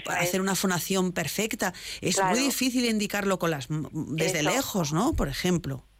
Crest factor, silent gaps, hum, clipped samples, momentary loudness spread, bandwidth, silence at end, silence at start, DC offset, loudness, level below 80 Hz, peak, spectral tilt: 12 dB; none; none; under 0.1%; 6 LU; 16 kHz; 0.2 s; 0 s; under 0.1%; -27 LUFS; -46 dBFS; -14 dBFS; -4 dB/octave